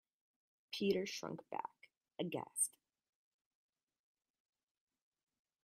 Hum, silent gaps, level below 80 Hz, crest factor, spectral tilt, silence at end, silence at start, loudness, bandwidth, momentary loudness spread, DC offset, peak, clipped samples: none; none; -86 dBFS; 22 dB; -3 dB/octave; 2.95 s; 0.7 s; -41 LUFS; 15 kHz; 11 LU; under 0.1%; -24 dBFS; under 0.1%